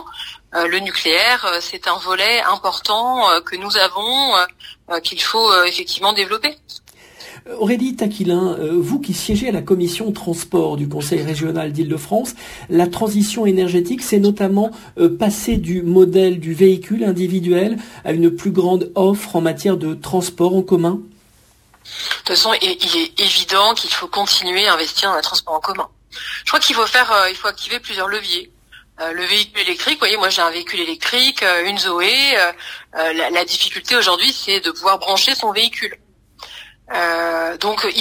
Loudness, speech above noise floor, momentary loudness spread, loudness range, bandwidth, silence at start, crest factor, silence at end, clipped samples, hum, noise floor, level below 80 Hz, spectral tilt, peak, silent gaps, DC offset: -16 LUFS; 35 dB; 10 LU; 5 LU; 16 kHz; 0 s; 18 dB; 0 s; under 0.1%; none; -52 dBFS; -46 dBFS; -3.5 dB/octave; 0 dBFS; none; under 0.1%